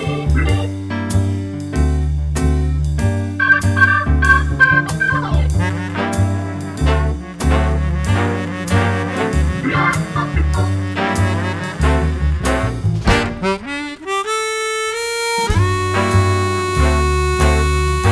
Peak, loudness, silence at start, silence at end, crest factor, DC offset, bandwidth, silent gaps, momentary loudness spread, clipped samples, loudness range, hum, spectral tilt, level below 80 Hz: 0 dBFS; -17 LUFS; 0 s; 0 s; 16 dB; under 0.1%; 11 kHz; none; 8 LU; under 0.1%; 4 LU; none; -5.5 dB/octave; -22 dBFS